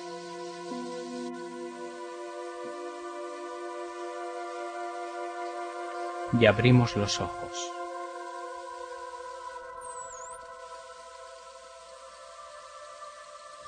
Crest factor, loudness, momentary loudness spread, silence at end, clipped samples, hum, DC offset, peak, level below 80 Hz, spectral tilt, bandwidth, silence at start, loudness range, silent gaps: 28 dB; -32 LUFS; 20 LU; 0 s; under 0.1%; none; under 0.1%; -4 dBFS; -60 dBFS; -5.5 dB/octave; 10 kHz; 0 s; 16 LU; none